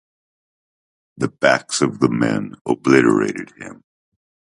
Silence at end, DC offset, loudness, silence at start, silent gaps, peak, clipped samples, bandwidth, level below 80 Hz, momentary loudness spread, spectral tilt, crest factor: 0.85 s; under 0.1%; -18 LUFS; 1.2 s; 2.61-2.65 s; 0 dBFS; under 0.1%; 11.5 kHz; -58 dBFS; 18 LU; -5 dB/octave; 20 dB